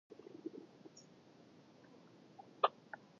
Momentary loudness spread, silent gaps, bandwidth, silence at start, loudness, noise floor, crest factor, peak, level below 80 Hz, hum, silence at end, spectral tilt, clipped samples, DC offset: 25 LU; none; 7.2 kHz; 0.1 s; -42 LUFS; -63 dBFS; 30 dB; -16 dBFS; under -90 dBFS; none; 0.15 s; -2 dB/octave; under 0.1%; under 0.1%